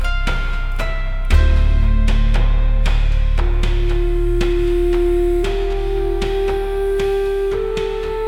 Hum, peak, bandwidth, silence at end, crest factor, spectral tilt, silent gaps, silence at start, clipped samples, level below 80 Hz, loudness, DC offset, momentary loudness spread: none; -2 dBFS; 8.8 kHz; 0 s; 14 dB; -7 dB/octave; none; 0 s; under 0.1%; -16 dBFS; -19 LUFS; under 0.1%; 5 LU